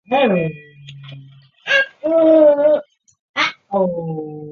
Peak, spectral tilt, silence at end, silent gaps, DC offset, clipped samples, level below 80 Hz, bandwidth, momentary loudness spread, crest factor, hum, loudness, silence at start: -2 dBFS; -6 dB/octave; 0 s; 3.19-3.34 s; under 0.1%; under 0.1%; -64 dBFS; 7 kHz; 19 LU; 16 dB; none; -16 LUFS; 0.1 s